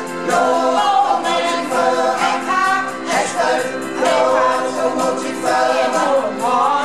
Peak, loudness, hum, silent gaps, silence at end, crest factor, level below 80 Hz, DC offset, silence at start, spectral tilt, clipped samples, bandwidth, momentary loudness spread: -4 dBFS; -16 LUFS; none; none; 0 s; 12 dB; -60 dBFS; 0.6%; 0 s; -3 dB/octave; under 0.1%; 13.5 kHz; 5 LU